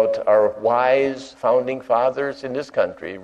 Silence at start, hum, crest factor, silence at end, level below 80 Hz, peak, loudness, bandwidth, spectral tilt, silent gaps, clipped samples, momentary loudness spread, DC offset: 0 s; none; 14 dB; 0 s; -62 dBFS; -6 dBFS; -20 LUFS; 8.6 kHz; -5.5 dB/octave; none; under 0.1%; 8 LU; under 0.1%